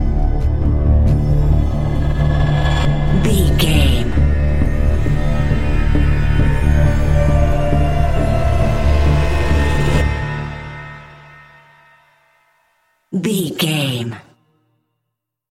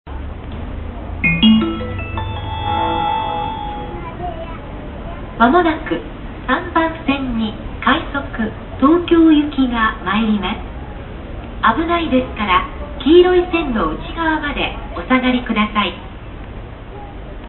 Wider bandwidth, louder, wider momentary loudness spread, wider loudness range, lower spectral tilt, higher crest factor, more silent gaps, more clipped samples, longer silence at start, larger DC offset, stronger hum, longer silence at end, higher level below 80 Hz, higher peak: first, 14 kHz vs 4.3 kHz; about the same, -16 LUFS vs -17 LUFS; second, 8 LU vs 19 LU; first, 8 LU vs 4 LU; second, -6.5 dB/octave vs -10.5 dB/octave; about the same, 14 dB vs 18 dB; neither; neither; about the same, 0 s vs 0.05 s; neither; neither; about the same, 0 s vs 0 s; first, -18 dBFS vs -30 dBFS; about the same, -2 dBFS vs 0 dBFS